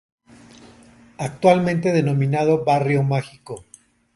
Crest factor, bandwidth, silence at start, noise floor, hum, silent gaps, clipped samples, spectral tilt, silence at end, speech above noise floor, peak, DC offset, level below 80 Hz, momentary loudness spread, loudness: 18 dB; 11.5 kHz; 1.2 s; -49 dBFS; none; none; under 0.1%; -7.5 dB/octave; 0.55 s; 30 dB; -2 dBFS; under 0.1%; -56 dBFS; 19 LU; -19 LUFS